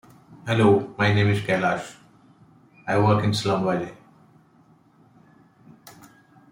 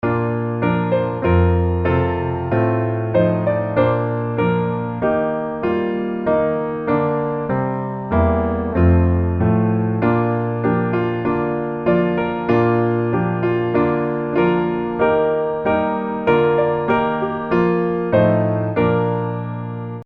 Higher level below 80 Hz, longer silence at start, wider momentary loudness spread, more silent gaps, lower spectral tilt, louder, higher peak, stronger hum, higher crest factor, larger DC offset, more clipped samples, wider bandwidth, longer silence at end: second, -60 dBFS vs -36 dBFS; first, 0.3 s vs 0.05 s; first, 17 LU vs 5 LU; neither; second, -6.5 dB/octave vs -11 dB/octave; second, -22 LUFS vs -19 LUFS; second, -6 dBFS vs 0 dBFS; neither; about the same, 20 dB vs 16 dB; neither; neither; first, 15.5 kHz vs 5 kHz; first, 0.6 s vs 0 s